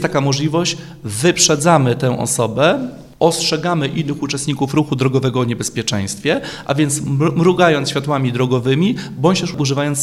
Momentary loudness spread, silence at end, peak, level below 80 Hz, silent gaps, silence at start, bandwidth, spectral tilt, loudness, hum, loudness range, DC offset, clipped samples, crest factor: 8 LU; 0 s; 0 dBFS; -48 dBFS; none; 0 s; 15 kHz; -4.5 dB/octave; -16 LUFS; none; 3 LU; under 0.1%; under 0.1%; 16 dB